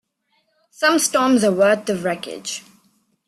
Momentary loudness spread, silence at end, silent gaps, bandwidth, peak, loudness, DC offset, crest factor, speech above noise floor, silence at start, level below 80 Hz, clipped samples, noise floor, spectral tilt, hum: 13 LU; 0.7 s; none; 14 kHz; -4 dBFS; -18 LUFS; under 0.1%; 16 dB; 49 dB; 0.8 s; -64 dBFS; under 0.1%; -67 dBFS; -3.5 dB/octave; none